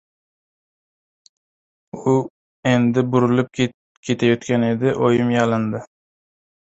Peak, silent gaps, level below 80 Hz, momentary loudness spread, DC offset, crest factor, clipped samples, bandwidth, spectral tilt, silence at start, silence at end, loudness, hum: -2 dBFS; 2.30-2.63 s, 3.74-4.03 s; -56 dBFS; 9 LU; under 0.1%; 18 dB; under 0.1%; 8 kHz; -7 dB/octave; 1.95 s; 0.9 s; -19 LUFS; none